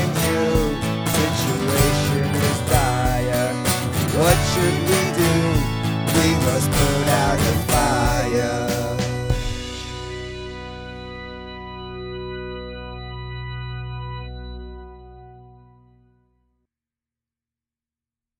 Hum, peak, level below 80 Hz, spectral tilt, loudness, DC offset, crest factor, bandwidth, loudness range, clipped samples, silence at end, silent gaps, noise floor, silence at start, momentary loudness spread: none; -2 dBFS; -32 dBFS; -5 dB/octave; -20 LUFS; under 0.1%; 20 dB; over 20 kHz; 15 LU; under 0.1%; 2.95 s; none; under -90 dBFS; 0 s; 16 LU